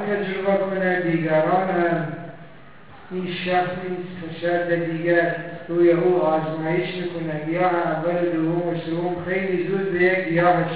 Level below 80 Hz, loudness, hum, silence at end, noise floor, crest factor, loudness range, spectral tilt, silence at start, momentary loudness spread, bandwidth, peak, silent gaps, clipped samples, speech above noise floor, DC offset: -58 dBFS; -22 LUFS; none; 0 s; -46 dBFS; 16 dB; 3 LU; -10.5 dB/octave; 0 s; 10 LU; 4 kHz; -6 dBFS; none; under 0.1%; 24 dB; 0.6%